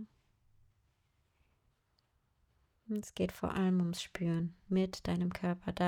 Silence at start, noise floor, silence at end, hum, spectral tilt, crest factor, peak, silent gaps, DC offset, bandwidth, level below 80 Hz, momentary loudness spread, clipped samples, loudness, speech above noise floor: 0 s; -77 dBFS; 0 s; none; -6.5 dB/octave; 16 dB; -20 dBFS; none; under 0.1%; 16 kHz; -62 dBFS; 9 LU; under 0.1%; -36 LUFS; 42 dB